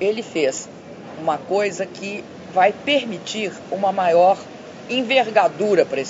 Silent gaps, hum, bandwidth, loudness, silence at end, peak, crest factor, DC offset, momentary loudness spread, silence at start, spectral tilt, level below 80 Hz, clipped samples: none; none; 8 kHz; -20 LUFS; 0 s; -2 dBFS; 20 dB; under 0.1%; 16 LU; 0 s; -4 dB/octave; -68 dBFS; under 0.1%